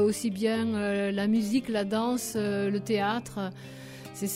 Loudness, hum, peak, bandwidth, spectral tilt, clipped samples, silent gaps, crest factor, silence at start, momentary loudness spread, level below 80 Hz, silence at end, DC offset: -29 LUFS; none; -14 dBFS; 16 kHz; -5 dB/octave; under 0.1%; none; 14 dB; 0 s; 11 LU; -64 dBFS; 0 s; under 0.1%